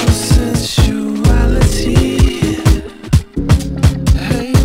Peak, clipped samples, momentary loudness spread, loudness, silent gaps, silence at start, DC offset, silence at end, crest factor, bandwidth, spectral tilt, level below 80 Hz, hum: 0 dBFS; 0.3%; 3 LU; -14 LUFS; none; 0 s; under 0.1%; 0 s; 12 dB; 16.5 kHz; -6 dB/octave; -16 dBFS; none